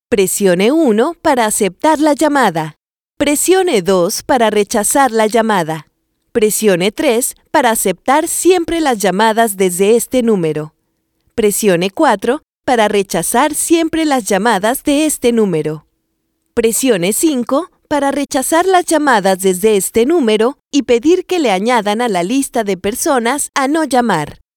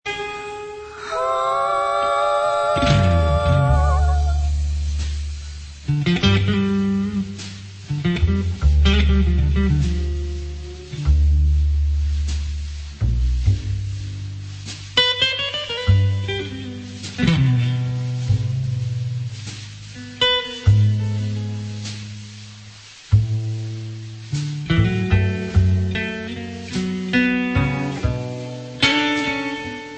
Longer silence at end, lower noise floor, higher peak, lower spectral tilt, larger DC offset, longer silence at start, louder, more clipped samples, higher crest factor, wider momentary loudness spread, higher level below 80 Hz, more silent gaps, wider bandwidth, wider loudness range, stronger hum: first, 0.25 s vs 0 s; first, -67 dBFS vs -41 dBFS; about the same, 0 dBFS vs -2 dBFS; second, -3.5 dB/octave vs -6 dB/octave; neither; about the same, 0.1 s vs 0.05 s; first, -13 LUFS vs -20 LUFS; neither; about the same, 12 dB vs 16 dB; second, 5 LU vs 15 LU; second, -46 dBFS vs -26 dBFS; first, 3.04-3.08 s, 12.49-12.53 s vs none; first, 19.5 kHz vs 8.6 kHz; about the same, 2 LU vs 4 LU; neither